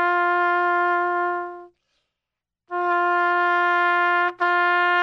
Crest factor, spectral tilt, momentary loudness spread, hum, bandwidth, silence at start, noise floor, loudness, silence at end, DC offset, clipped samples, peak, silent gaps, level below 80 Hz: 14 dB; -3.5 dB/octave; 8 LU; none; 6.8 kHz; 0 s; -86 dBFS; -20 LUFS; 0 s; under 0.1%; under 0.1%; -8 dBFS; none; -74 dBFS